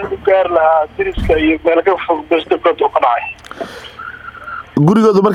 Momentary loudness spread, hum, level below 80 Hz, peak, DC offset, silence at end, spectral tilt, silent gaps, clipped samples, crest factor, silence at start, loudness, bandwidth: 17 LU; none; -34 dBFS; 0 dBFS; under 0.1%; 0 s; -7.5 dB/octave; none; under 0.1%; 14 dB; 0 s; -13 LUFS; 12.5 kHz